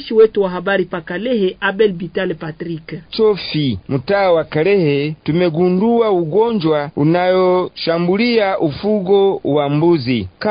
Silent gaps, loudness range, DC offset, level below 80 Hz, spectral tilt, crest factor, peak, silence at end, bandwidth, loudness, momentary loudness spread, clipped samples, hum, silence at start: none; 3 LU; under 0.1%; -48 dBFS; -12 dB/octave; 14 dB; -2 dBFS; 0 s; 5.2 kHz; -16 LUFS; 8 LU; under 0.1%; none; 0 s